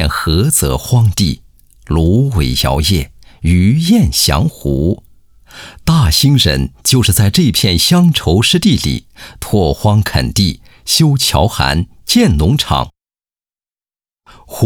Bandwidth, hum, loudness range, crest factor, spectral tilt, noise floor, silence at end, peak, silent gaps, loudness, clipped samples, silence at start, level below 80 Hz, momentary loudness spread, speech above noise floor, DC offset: over 20 kHz; none; 3 LU; 12 dB; -4.5 dB/octave; under -90 dBFS; 0 s; 0 dBFS; none; -12 LUFS; under 0.1%; 0 s; -26 dBFS; 9 LU; over 78 dB; under 0.1%